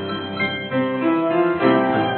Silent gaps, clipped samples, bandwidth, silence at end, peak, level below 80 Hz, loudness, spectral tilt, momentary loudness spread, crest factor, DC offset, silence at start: none; under 0.1%; 4.3 kHz; 0 s; -4 dBFS; -58 dBFS; -20 LUFS; -10.5 dB/octave; 6 LU; 16 dB; under 0.1%; 0 s